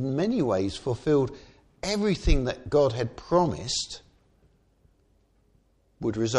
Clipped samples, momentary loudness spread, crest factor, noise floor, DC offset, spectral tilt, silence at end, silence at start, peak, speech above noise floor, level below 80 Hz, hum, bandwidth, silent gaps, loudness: under 0.1%; 9 LU; 20 dB; -65 dBFS; under 0.1%; -5.5 dB/octave; 0 s; 0 s; -8 dBFS; 40 dB; -36 dBFS; none; 11.5 kHz; none; -27 LUFS